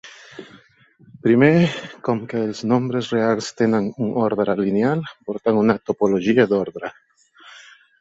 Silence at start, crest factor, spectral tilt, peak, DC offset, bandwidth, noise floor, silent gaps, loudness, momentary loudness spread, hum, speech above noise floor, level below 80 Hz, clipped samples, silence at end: 0.05 s; 18 dB; -7 dB/octave; -2 dBFS; under 0.1%; 8 kHz; -48 dBFS; none; -20 LUFS; 14 LU; none; 29 dB; -60 dBFS; under 0.1%; 0.4 s